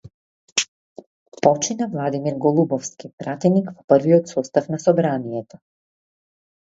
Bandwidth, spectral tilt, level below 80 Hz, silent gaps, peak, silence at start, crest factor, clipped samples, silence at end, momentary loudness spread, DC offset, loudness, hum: 8 kHz; -5.5 dB/octave; -64 dBFS; 0.68-0.96 s, 1.06-1.32 s, 3.13-3.18 s, 3.84-3.88 s; 0 dBFS; 0.55 s; 22 dB; under 0.1%; 1.25 s; 12 LU; under 0.1%; -20 LUFS; none